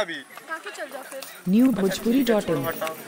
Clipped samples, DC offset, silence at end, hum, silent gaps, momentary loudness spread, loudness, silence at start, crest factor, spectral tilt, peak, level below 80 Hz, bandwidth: under 0.1%; under 0.1%; 0 s; none; none; 15 LU; -23 LUFS; 0 s; 16 dB; -5.5 dB/octave; -8 dBFS; -56 dBFS; 16.5 kHz